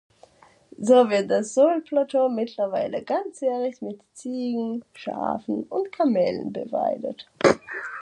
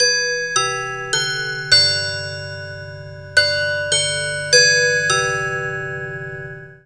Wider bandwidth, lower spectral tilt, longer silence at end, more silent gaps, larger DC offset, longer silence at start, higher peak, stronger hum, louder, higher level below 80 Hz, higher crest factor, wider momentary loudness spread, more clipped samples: about the same, 10 kHz vs 11 kHz; first, -5 dB/octave vs -1 dB/octave; about the same, 0 s vs 0.1 s; neither; second, under 0.1% vs 0.3%; first, 0.8 s vs 0 s; second, -4 dBFS vs 0 dBFS; neither; second, -24 LUFS vs -16 LUFS; second, -66 dBFS vs -52 dBFS; about the same, 22 dB vs 20 dB; second, 13 LU vs 18 LU; neither